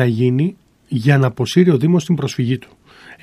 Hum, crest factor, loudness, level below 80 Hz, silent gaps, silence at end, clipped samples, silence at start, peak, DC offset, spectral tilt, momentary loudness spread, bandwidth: none; 16 dB; -16 LUFS; -58 dBFS; none; 0.1 s; under 0.1%; 0 s; 0 dBFS; under 0.1%; -7 dB/octave; 9 LU; 13 kHz